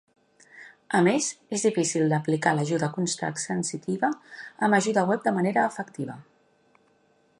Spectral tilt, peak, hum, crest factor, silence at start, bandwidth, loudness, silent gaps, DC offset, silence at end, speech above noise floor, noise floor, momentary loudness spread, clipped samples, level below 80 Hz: -5 dB/octave; -8 dBFS; none; 20 dB; 0.55 s; 11.5 kHz; -25 LUFS; none; under 0.1%; 1.2 s; 39 dB; -64 dBFS; 12 LU; under 0.1%; -74 dBFS